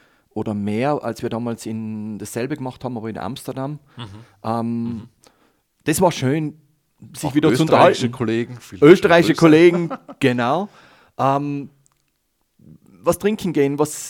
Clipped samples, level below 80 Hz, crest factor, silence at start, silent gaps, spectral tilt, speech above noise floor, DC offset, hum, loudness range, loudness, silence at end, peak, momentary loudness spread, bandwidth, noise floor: under 0.1%; -56 dBFS; 20 dB; 0.35 s; none; -6 dB/octave; 50 dB; under 0.1%; none; 13 LU; -19 LUFS; 0 s; 0 dBFS; 18 LU; 17 kHz; -69 dBFS